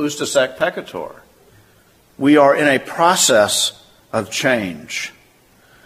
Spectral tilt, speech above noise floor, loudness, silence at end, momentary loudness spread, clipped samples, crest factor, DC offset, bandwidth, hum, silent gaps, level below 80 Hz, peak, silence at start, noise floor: -2.5 dB/octave; 36 dB; -16 LUFS; 0.75 s; 16 LU; under 0.1%; 18 dB; under 0.1%; 15.5 kHz; none; none; -58 dBFS; 0 dBFS; 0 s; -52 dBFS